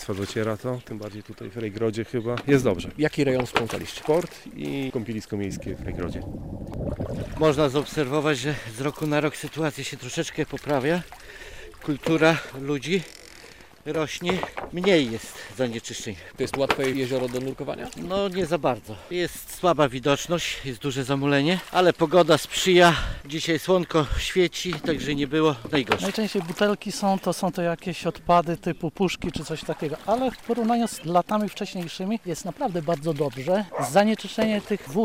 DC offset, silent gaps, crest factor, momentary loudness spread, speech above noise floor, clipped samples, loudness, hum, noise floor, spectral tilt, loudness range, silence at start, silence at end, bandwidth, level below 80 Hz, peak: 0.2%; none; 18 dB; 12 LU; 23 dB; under 0.1%; -25 LUFS; none; -47 dBFS; -5 dB/octave; 6 LU; 0 s; 0 s; 16 kHz; -46 dBFS; -6 dBFS